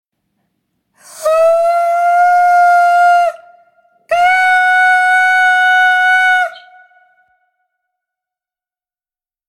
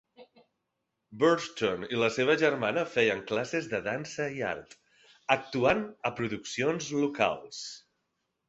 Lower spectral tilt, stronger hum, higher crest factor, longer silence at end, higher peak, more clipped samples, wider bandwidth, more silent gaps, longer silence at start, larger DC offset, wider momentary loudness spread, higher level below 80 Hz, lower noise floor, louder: second, 1 dB/octave vs -4.5 dB/octave; neither; second, 12 dB vs 24 dB; first, 2.9 s vs 0.7 s; first, -2 dBFS vs -6 dBFS; neither; first, 14.5 kHz vs 8.2 kHz; neither; first, 1.15 s vs 0.2 s; neither; second, 6 LU vs 11 LU; about the same, -60 dBFS vs -64 dBFS; first, under -90 dBFS vs -83 dBFS; first, -10 LUFS vs -29 LUFS